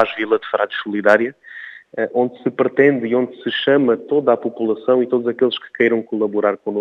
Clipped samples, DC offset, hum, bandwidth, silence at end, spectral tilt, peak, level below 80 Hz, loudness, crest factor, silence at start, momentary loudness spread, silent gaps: under 0.1%; under 0.1%; none; 6.8 kHz; 0 s; -7 dB/octave; 0 dBFS; -74 dBFS; -18 LUFS; 18 dB; 0 s; 7 LU; none